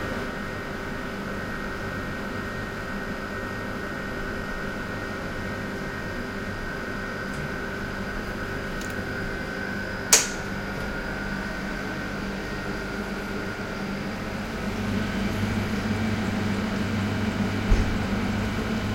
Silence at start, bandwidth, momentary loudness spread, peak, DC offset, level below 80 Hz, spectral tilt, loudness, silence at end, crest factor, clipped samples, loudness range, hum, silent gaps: 0 s; 16 kHz; 5 LU; 0 dBFS; under 0.1%; -38 dBFS; -4 dB/octave; -29 LUFS; 0 s; 28 dB; under 0.1%; 5 LU; none; none